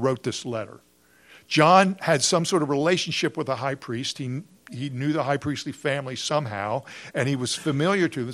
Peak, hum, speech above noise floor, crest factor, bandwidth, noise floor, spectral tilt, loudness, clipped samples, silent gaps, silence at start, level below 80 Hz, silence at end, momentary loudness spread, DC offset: -2 dBFS; none; 30 dB; 22 dB; 13.5 kHz; -54 dBFS; -4.5 dB/octave; -24 LUFS; under 0.1%; none; 0 s; -66 dBFS; 0 s; 13 LU; under 0.1%